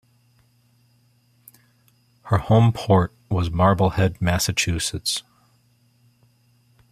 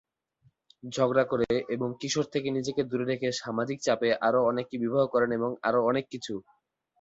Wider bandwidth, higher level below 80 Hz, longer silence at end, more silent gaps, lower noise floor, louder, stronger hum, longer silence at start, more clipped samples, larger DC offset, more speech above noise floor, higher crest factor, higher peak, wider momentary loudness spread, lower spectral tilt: first, 15 kHz vs 8 kHz; first, -46 dBFS vs -64 dBFS; first, 1.7 s vs 0.6 s; neither; second, -61 dBFS vs -67 dBFS; first, -21 LUFS vs -28 LUFS; neither; first, 2.25 s vs 0.85 s; neither; neither; about the same, 41 dB vs 40 dB; about the same, 20 dB vs 18 dB; first, -2 dBFS vs -10 dBFS; about the same, 8 LU vs 8 LU; about the same, -5 dB/octave vs -5 dB/octave